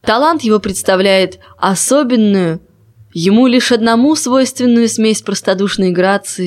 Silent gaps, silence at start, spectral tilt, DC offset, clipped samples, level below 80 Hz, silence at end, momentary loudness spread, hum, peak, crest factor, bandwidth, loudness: none; 0.05 s; -4 dB/octave; under 0.1%; under 0.1%; -48 dBFS; 0 s; 6 LU; none; 0 dBFS; 12 dB; 15 kHz; -12 LUFS